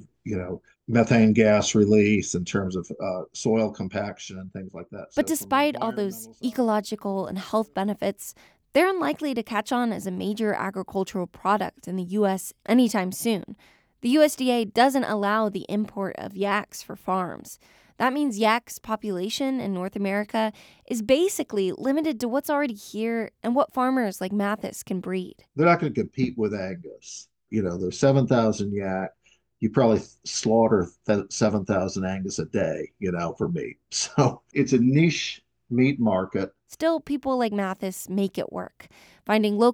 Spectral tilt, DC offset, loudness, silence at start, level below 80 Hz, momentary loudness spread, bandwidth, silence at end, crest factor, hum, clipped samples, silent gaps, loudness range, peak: -5.5 dB/octave; under 0.1%; -25 LUFS; 0.25 s; -60 dBFS; 12 LU; 19.5 kHz; 0 s; 20 dB; none; under 0.1%; none; 4 LU; -4 dBFS